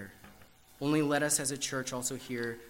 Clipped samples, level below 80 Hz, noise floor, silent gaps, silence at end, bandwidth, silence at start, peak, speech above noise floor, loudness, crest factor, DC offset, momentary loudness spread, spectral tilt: under 0.1%; -66 dBFS; -57 dBFS; none; 0 s; 16 kHz; 0 s; -14 dBFS; 25 dB; -32 LUFS; 20 dB; under 0.1%; 9 LU; -3.5 dB/octave